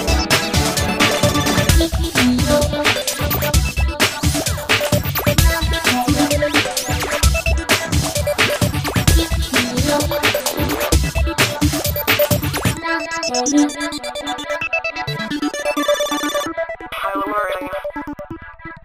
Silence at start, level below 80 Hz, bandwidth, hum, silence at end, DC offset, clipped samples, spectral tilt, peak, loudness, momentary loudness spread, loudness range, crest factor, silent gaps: 0 s; -26 dBFS; 15.5 kHz; none; 0.05 s; under 0.1%; under 0.1%; -4 dB/octave; 0 dBFS; -17 LUFS; 8 LU; 5 LU; 18 dB; none